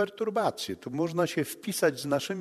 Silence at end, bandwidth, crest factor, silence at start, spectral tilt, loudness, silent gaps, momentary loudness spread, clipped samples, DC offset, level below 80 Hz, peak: 0 s; 13.5 kHz; 18 dB; 0 s; -4.5 dB/octave; -30 LUFS; none; 5 LU; under 0.1%; under 0.1%; -70 dBFS; -12 dBFS